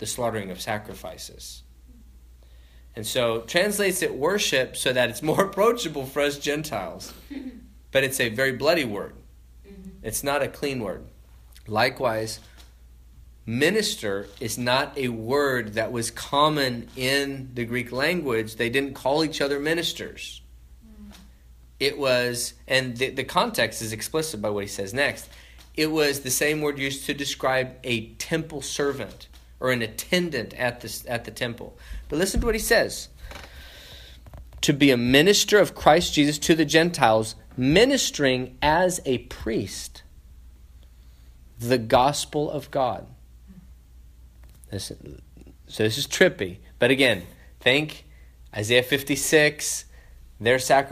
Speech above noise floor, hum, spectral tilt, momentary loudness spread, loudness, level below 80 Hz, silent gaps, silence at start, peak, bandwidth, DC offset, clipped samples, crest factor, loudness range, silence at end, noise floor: 26 dB; none; -3.5 dB/octave; 19 LU; -23 LUFS; -46 dBFS; none; 0 s; 0 dBFS; 15.5 kHz; under 0.1%; under 0.1%; 24 dB; 8 LU; 0 s; -50 dBFS